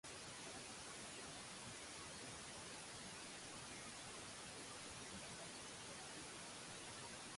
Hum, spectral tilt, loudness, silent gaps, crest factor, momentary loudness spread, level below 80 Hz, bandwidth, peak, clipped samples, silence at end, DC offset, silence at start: none; -2 dB/octave; -52 LUFS; none; 12 dB; 0 LU; -74 dBFS; 11.5 kHz; -42 dBFS; under 0.1%; 0 s; under 0.1%; 0.05 s